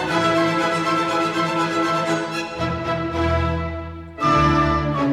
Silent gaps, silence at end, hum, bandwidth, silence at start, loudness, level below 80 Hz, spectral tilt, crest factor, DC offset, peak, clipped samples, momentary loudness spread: none; 0 s; none; 13.5 kHz; 0 s; -20 LUFS; -36 dBFS; -5.5 dB/octave; 14 dB; under 0.1%; -6 dBFS; under 0.1%; 8 LU